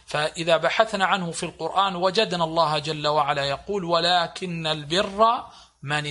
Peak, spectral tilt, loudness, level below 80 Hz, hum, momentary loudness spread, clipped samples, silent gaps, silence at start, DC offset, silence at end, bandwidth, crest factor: -2 dBFS; -4 dB/octave; -23 LUFS; -56 dBFS; none; 8 LU; under 0.1%; none; 0.1 s; under 0.1%; 0 s; 11.5 kHz; 20 dB